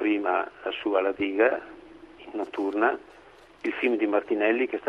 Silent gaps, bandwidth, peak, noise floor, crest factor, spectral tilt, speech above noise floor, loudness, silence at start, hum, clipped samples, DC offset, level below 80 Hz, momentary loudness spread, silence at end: none; 6.2 kHz; -8 dBFS; -48 dBFS; 18 dB; -5.5 dB/octave; 22 dB; -26 LUFS; 0 s; none; under 0.1%; under 0.1%; -64 dBFS; 11 LU; 0 s